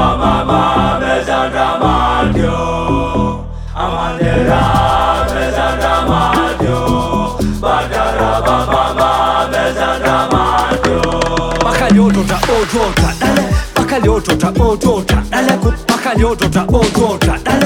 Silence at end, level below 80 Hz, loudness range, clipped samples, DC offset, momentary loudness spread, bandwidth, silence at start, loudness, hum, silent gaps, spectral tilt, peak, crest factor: 0 s; -22 dBFS; 2 LU; under 0.1%; under 0.1%; 4 LU; 18.5 kHz; 0 s; -13 LUFS; none; none; -5.5 dB/octave; 0 dBFS; 12 dB